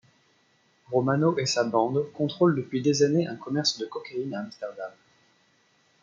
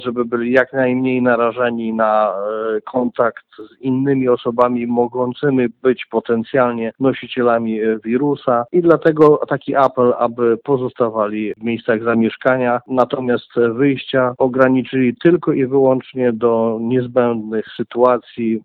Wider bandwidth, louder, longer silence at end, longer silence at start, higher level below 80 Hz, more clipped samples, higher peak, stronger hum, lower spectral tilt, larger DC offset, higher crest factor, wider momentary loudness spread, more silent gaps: first, 8.8 kHz vs 4.9 kHz; second, -26 LUFS vs -16 LUFS; first, 1.1 s vs 0.05 s; first, 0.9 s vs 0 s; second, -72 dBFS vs -58 dBFS; neither; second, -8 dBFS vs 0 dBFS; neither; second, -5 dB/octave vs -9 dB/octave; neither; about the same, 18 dB vs 16 dB; first, 13 LU vs 6 LU; neither